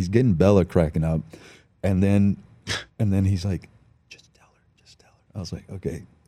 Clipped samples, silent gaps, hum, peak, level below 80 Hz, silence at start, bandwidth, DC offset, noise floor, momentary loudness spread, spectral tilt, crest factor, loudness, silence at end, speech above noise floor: under 0.1%; none; none; -4 dBFS; -44 dBFS; 0 s; 12 kHz; under 0.1%; -59 dBFS; 16 LU; -7.5 dB/octave; 20 dB; -23 LUFS; 0.25 s; 37 dB